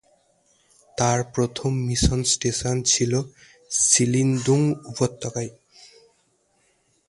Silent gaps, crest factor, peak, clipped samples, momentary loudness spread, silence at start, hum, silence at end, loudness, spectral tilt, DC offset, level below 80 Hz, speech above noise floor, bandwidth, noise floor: none; 22 dB; -2 dBFS; under 0.1%; 13 LU; 0.95 s; none; 1.6 s; -22 LUFS; -4 dB/octave; under 0.1%; -40 dBFS; 44 dB; 11.5 kHz; -66 dBFS